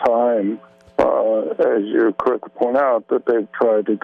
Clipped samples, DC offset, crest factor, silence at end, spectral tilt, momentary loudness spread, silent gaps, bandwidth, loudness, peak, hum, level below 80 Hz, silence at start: under 0.1%; under 0.1%; 14 dB; 0.05 s; -8 dB/octave; 5 LU; none; 6.4 kHz; -19 LUFS; -4 dBFS; none; -58 dBFS; 0 s